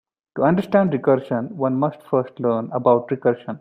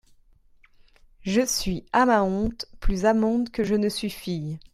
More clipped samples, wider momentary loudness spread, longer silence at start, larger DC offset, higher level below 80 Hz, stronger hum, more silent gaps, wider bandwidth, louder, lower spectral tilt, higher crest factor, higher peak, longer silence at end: neither; second, 5 LU vs 11 LU; second, 0.35 s vs 1.2 s; neither; second, -62 dBFS vs -36 dBFS; neither; neither; second, 8.2 kHz vs 16 kHz; first, -20 LUFS vs -24 LUFS; first, -9.5 dB/octave vs -4.5 dB/octave; about the same, 18 dB vs 18 dB; first, -2 dBFS vs -8 dBFS; second, 0 s vs 0.15 s